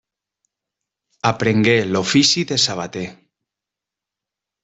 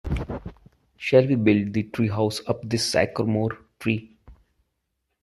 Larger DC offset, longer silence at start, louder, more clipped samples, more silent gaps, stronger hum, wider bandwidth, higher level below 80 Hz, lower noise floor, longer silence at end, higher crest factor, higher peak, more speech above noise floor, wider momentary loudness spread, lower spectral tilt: neither; first, 1.25 s vs 0.05 s; first, -17 LUFS vs -24 LUFS; neither; neither; neither; second, 8.4 kHz vs 13 kHz; second, -56 dBFS vs -44 dBFS; first, -86 dBFS vs -77 dBFS; first, 1.5 s vs 0.9 s; about the same, 18 dB vs 20 dB; about the same, -2 dBFS vs -4 dBFS; first, 69 dB vs 55 dB; about the same, 13 LU vs 12 LU; second, -3.5 dB/octave vs -6 dB/octave